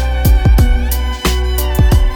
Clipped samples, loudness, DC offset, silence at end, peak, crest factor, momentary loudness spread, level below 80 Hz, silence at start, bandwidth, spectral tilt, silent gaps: under 0.1%; -14 LUFS; under 0.1%; 0 s; 0 dBFS; 10 dB; 5 LU; -12 dBFS; 0 s; 19.5 kHz; -5.5 dB/octave; none